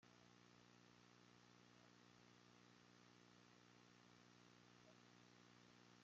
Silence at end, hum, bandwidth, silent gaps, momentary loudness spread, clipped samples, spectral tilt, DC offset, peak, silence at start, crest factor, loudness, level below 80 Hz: 0 s; 60 Hz at -75 dBFS; 7.4 kHz; none; 0 LU; under 0.1%; -3.5 dB/octave; under 0.1%; -56 dBFS; 0 s; 14 dB; -70 LUFS; under -90 dBFS